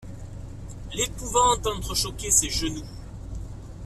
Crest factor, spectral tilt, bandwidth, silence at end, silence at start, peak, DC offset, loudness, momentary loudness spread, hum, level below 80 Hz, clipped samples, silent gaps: 22 dB; -2.5 dB/octave; 15.5 kHz; 0 s; 0 s; -6 dBFS; under 0.1%; -24 LUFS; 20 LU; none; -38 dBFS; under 0.1%; none